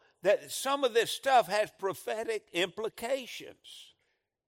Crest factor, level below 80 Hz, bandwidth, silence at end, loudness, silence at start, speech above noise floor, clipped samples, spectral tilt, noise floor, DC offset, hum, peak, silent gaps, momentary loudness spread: 20 dB; -76 dBFS; 16.5 kHz; 0.65 s; -31 LUFS; 0.25 s; 48 dB; under 0.1%; -2.5 dB/octave; -79 dBFS; under 0.1%; none; -12 dBFS; none; 19 LU